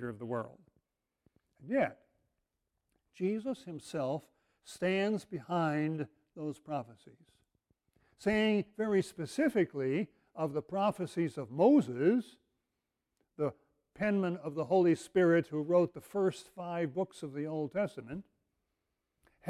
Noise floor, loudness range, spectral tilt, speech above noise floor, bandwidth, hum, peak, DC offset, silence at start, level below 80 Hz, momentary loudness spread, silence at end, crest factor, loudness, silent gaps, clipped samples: -87 dBFS; 7 LU; -7 dB/octave; 54 dB; 14 kHz; none; -16 dBFS; under 0.1%; 0 s; -72 dBFS; 13 LU; 0 s; 20 dB; -33 LUFS; none; under 0.1%